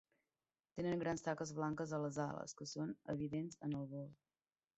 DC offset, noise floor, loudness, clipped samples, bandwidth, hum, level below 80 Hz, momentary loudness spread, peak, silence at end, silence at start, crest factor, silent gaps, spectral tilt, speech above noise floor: under 0.1%; under -90 dBFS; -44 LUFS; under 0.1%; 8 kHz; none; -74 dBFS; 8 LU; -26 dBFS; 0.65 s; 0.75 s; 20 dB; none; -6.5 dB/octave; over 47 dB